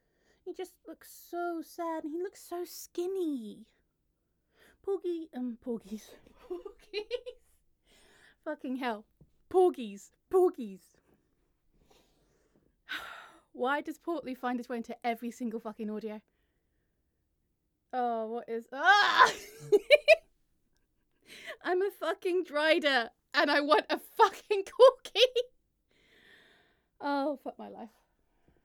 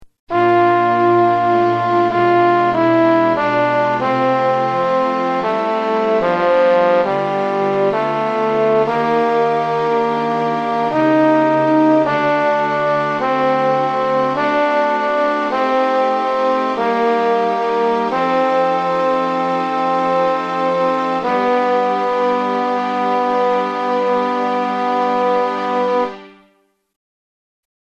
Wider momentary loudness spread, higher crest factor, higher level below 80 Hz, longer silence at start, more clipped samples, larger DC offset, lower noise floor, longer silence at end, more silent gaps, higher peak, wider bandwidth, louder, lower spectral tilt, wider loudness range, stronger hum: first, 21 LU vs 5 LU; first, 26 dB vs 12 dB; second, -72 dBFS vs -58 dBFS; first, 0.45 s vs 0 s; neither; neither; first, -79 dBFS vs -59 dBFS; second, 0.75 s vs 1.55 s; second, none vs 0.19-0.27 s; about the same, -6 dBFS vs -4 dBFS; first, 18.5 kHz vs 8.4 kHz; second, -30 LUFS vs -16 LUFS; second, -3 dB/octave vs -6.5 dB/octave; first, 14 LU vs 3 LU; neither